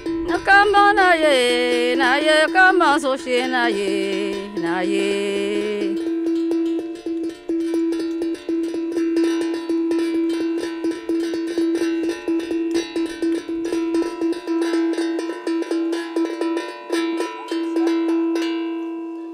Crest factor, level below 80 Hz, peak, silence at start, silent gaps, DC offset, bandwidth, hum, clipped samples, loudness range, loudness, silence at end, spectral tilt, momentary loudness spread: 16 dB; -54 dBFS; -4 dBFS; 0 s; none; under 0.1%; 12 kHz; none; under 0.1%; 7 LU; -20 LUFS; 0 s; -3.5 dB/octave; 11 LU